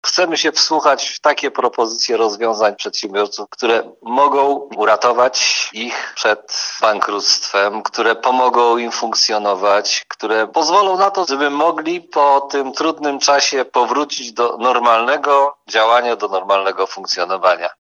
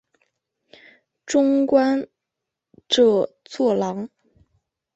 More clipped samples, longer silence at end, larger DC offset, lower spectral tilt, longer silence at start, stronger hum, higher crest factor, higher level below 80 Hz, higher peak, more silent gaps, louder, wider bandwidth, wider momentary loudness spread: neither; second, 0.1 s vs 0.9 s; neither; second, -1 dB/octave vs -4.5 dB/octave; second, 0.05 s vs 1.25 s; neither; about the same, 16 dB vs 18 dB; second, -76 dBFS vs -66 dBFS; first, 0 dBFS vs -4 dBFS; neither; first, -15 LUFS vs -20 LUFS; about the same, 7.8 kHz vs 8.2 kHz; second, 7 LU vs 14 LU